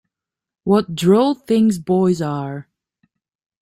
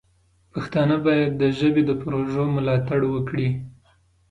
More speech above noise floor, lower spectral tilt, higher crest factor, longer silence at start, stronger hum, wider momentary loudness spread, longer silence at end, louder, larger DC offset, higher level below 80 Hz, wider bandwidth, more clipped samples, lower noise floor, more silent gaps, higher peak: first, 71 dB vs 40 dB; second, -7 dB/octave vs -8.5 dB/octave; about the same, 16 dB vs 14 dB; about the same, 0.65 s vs 0.55 s; neither; first, 14 LU vs 10 LU; first, 1 s vs 0.6 s; first, -17 LUFS vs -22 LUFS; neither; about the same, -56 dBFS vs -52 dBFS; first, 15 kHz vs 7.8 kHz; neither; first, -87 dBFS vs -61 dBFS; neither; first, -4 dBFS vs -8 dBFS